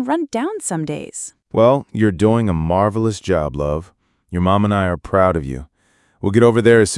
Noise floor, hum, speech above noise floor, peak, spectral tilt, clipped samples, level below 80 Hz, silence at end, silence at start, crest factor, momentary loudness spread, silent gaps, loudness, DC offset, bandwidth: -59 dBFS; none; 43 dB; 0 dBFS; -6 dB/octave; under 0.1%; -40 dBFS; 0 s; 0 s; 16 dB; 13 LU; none; -17 LUFS; under 0.1%; 12 kHz